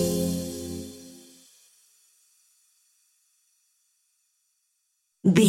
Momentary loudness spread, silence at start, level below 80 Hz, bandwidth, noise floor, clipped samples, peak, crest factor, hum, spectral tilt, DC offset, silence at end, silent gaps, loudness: 27 LU; 0 s; -58 dBFS; 16.5 kHz; -75 dBFS; under 0.1%; -6 dBFS; 24 dB; none; -5.5 dB/octave; under 0.1%; 0 s; none; -29 LUFS